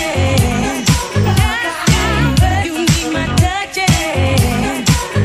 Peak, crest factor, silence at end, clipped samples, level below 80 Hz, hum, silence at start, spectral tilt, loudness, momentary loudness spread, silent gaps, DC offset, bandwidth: 0 dBFS; 14 dB; 0 s; under 0.1%; -24 dBFS; none; 0 s; -4.5 dB/octave; -14 LUFS; 3 LU; none; 0.1%; 15.5 kHz